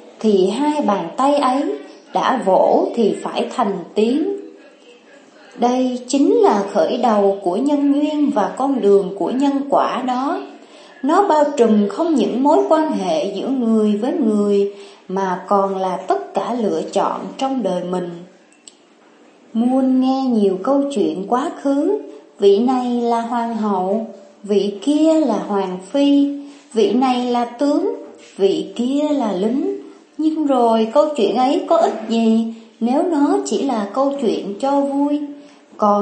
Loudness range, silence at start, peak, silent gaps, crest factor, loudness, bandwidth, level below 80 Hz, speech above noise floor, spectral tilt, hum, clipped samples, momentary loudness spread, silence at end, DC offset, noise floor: 4 LU; 0.05 s; 0 dBFS; none; 16 dB; -18 LUFS; 8.8 kHz; -74 dBFS; 33 dB; -6 dB/octave; none; under 0.1%; 9 LU; 0 s; under 0.1%; -50 dBFS